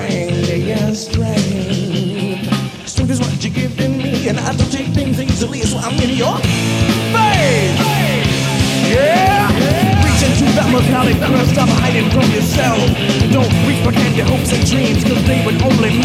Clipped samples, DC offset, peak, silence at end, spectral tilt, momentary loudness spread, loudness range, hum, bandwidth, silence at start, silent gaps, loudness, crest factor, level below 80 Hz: under 0.1%; under 0.1%; 0 dBFS; 0 s; -5.5 dB/octave; 6 LU; 5 LU; none; 16 kHz; 0 s; none; -14 LUFS; 14 dB; -30 dBFS